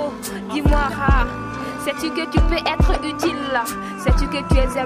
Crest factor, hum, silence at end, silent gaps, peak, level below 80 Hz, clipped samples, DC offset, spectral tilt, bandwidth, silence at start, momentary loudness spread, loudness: 16 dB; none; 0 s; none; -2 dBFS; -22 dBFS; under 0.1%; under 0.1%; -5.5 dB/octave; 15.5 kHz; 0 s; 7 LU; -21 LUFS